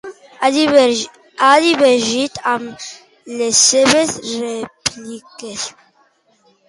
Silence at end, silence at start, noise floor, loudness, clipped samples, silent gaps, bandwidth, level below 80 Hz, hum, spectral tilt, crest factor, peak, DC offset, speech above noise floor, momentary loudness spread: 1 s; 0.05 s; -57 dBFS; -14 LUFS; under 0.1%; none; 11.5 kHz; -58 dBFS; none; -1.5 dB/octave; 16 dB; 0 dBFS; under 0.1%; 42 dB; 20 LU